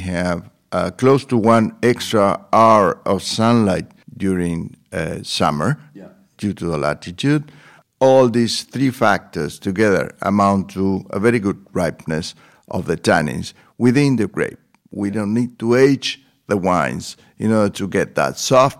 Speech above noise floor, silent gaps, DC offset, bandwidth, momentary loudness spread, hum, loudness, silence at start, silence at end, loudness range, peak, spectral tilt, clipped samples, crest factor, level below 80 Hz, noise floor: 25 dB; none; under 0.1%; 15.5 kHz; 12 LU; none; -18 LUFS; 0 s; 0.05 s; 5 LU; 0 dBFS; -5.5 dB/octave; under 0.1%; 18 dB; -50 dBFS; -42 dBFS